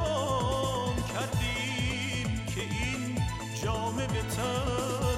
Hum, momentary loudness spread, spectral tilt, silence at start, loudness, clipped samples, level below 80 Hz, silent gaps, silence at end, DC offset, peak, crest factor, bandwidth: none; 4 LU; -4.5 dB/octave; 0 s; -31 LUFS; under 0.1%; -42 dBFS; none; 0 s; under 0.1%; -18 dBFS; 14 dB; 16.5 kHz